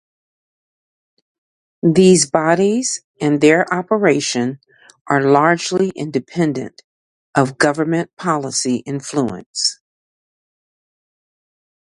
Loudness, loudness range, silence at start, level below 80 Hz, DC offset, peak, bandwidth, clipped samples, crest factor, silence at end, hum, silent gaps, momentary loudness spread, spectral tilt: -16 LUFS; 7 LU; 1.85 s; -60 dBFS; under 0.1%; 0 dBFS; 11.5 kHz; under 0.1%; 18 dB; 2.15 s; none; 3.04-3.14 s, 5.01-5.05 s, 6.84-7.33 s, 8.13-8.17 s, 9.46-9.54 s; 10 LU; -4.5 dB/octave